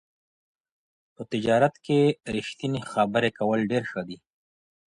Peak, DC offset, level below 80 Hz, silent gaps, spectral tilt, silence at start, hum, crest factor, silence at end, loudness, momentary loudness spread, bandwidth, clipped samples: -8 dBFS; under 0.1%; -62 dBFS; none; -6.5 dB/octave; 1.2 s; none; 18 dB; 0.7 s; -25 LUFS; 12 LU; 11 kHz; under 0.1%